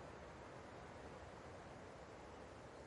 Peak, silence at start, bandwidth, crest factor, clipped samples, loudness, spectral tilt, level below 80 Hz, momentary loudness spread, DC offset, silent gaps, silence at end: -44 dBFS; 0 s; 11 kHz; 12 dB; under 0.1%; -56 LUFS; -5.5 dB/octave; -68 dBFS; 1 LU; under 0.1%; none; 0 s